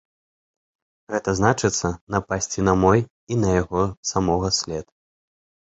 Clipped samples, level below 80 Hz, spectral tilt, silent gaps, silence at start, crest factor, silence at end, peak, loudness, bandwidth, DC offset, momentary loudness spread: under 0.1%; -42 dBFS; -5 dB/octave; 2.01-2.07 s, 3.11-3.27 s, 3.97-4.03 s; 1.1 s; 22 dB; 0.9 s; -2 dBFS; -22 LUFS; 8.2 kHz; under 0.1%; 9 LU